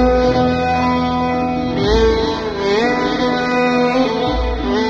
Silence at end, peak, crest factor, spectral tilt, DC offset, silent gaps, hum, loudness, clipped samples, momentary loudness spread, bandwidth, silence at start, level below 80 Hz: 0 s; -2 dBFS; 14 dB; -6 dB/octave; under 0.1%; none; none; -16 LUFS; under 0.1%; 5 LU; 7.6 kHz; 0 s; -28 dBFS